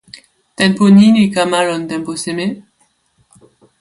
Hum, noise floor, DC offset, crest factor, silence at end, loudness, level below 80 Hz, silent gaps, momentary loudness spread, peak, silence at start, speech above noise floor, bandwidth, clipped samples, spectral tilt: none; -59 dBFS; under 0.1%; 14 dB; 1.2 s; -13 LUFS; -56 dBFS; none; 14 LU; 0 dBFS; 0.6 s; 47 dB; 11.5 kHz; under 0.1%; -5.5 dB/octave